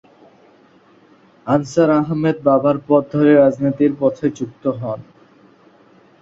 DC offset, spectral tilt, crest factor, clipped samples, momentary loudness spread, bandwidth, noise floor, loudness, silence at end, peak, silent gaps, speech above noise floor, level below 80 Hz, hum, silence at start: under 0.1%; -8 dB/octave; 16 dB; under 0.1%; 11 LU; 7.8 kHz; -50 dBFS; -16 LUFS; 1.2 s; -2 dBFS; none; 35 dB; -56 dBFS; none; 1.45 s